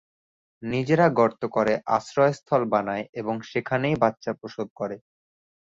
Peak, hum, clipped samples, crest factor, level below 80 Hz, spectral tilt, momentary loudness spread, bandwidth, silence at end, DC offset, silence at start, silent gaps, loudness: -6 dBFS; none; under 0.1%; 20 dB; -62 dBFS; -7 dB/octave; 13 LU; 7.8 kHz; 0.8 s; under 0.1%; 0.6 s; 3.09-3.13 s, 4.70-4.76 s; -24 LUFS